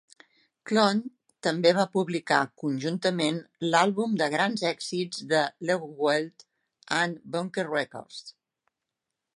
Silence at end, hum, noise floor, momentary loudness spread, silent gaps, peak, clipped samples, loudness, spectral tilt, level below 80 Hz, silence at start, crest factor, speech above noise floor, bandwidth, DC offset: 1.05 s; none; -86 dBFS; 9 LU; none; -6 dBFS; under 0.1%; -27 LUFS; -4.5 dB/octave; -78 dBFS; 0.65 s; 22 dB; 59 dB; 11.5 kHz; under 0.1%